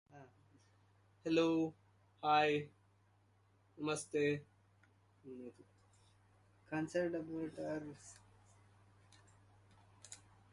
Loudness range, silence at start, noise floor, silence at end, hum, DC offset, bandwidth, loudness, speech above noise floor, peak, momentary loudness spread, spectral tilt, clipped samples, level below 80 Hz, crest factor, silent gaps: 8 LU; 0.15 s; -72 dBFS; 0.35 s; none; under 0.1%; 11.5 kHz; -38 LUFS; 34 dB; -20 dBFS; 23 LU; -5 dB/octave; under 0.1%; -78 dBFS; 24 dB; none